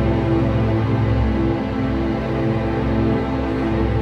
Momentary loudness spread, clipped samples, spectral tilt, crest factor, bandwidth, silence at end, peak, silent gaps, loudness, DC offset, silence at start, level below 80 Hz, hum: 3 LU; under 0.1%; -9 dB/octave; 12 dB; 6.4 kHz; 0 s; -8 dBFS; none; -20 LUFS; under 0.1%; 0 s; -28 dBFS; none